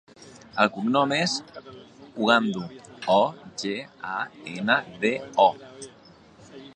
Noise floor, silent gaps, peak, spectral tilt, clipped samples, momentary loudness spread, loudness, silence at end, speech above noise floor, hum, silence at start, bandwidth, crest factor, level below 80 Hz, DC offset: -52 dBFS; none; -2 dBFS; -4 dB/octave; under 0.1%; 21 LU; -25 LUFS; 0.05 s; 27 dB; none; 0.25 s; 9.8 kHz; 24 dB; -68 dBFS; under 0.1%